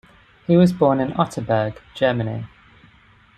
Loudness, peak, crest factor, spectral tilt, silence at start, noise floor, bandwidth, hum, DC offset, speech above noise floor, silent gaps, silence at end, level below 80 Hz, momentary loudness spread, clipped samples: -20 LUFS; -2 dBFS; 20 dB; -7.5 dB/octave; 0.5 s; -52 dBFS; 9.6 kHz; none; under 0.1%; 34 dB; none; 0.9 s; -52 dBFS; 15 LU; under 0.1%